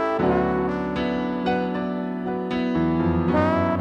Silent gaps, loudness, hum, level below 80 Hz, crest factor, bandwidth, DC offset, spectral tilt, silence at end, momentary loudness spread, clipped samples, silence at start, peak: none; -23 LUFS; none; -44 dBFS; 16 dB; 6.8 kHz; under 0.1%; -8.5 dB/octave; 0 s; 6 LU; under 0.1%; 0 s; -8 dBFS